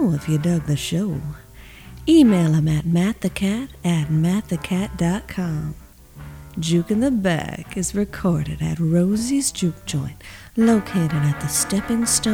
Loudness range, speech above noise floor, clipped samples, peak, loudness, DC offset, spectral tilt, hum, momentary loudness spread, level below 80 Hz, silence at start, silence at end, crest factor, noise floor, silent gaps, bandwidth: 4 LU; 21 dB; under 0.1%; -4 dBFS; -21 LUFS; under 0.1%; -5.5 dB/octave; none; 12 LU; -42 dBFS; 0 s; 0 s; 16 dB; -41 dBFS; none; 17 kHz